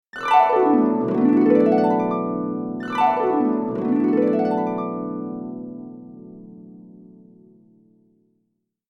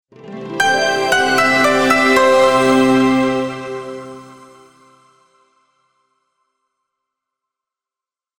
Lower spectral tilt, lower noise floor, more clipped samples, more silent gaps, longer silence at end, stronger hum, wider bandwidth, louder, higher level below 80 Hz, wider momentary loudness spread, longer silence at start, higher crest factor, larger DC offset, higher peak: first, -8 dB/octave vs -3.5 dB/octave; second, -74 dBFS vs -90 dBFS; neither; neither; second, 2.1 s vs 4.05 s; neither; second, 8.4 kHz vs 18.5 kHz; second, -20 LUFS vs -13 LUFS; second, -64 dBFS vs -52 dBFS; about the same, 19 LU vs 19 LU; about the same, 0.15 s vs 0.25 s; about the same, 18 dB vs 18 dB; neither; second, -4 dBFS vs 0 dBFS